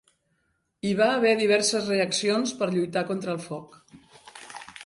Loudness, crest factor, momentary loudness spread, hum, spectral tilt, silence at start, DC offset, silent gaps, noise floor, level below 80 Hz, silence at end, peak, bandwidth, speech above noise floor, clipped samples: -24 LUFS; 18 dB; 19 LU; none; -3.5 dB/octave; 0.85 s; under 0.1%; none; -73 dBFS; -68 dBFS; 0 s; -10 dBFS; 11.5 kHz; 48 dB; under 0.1%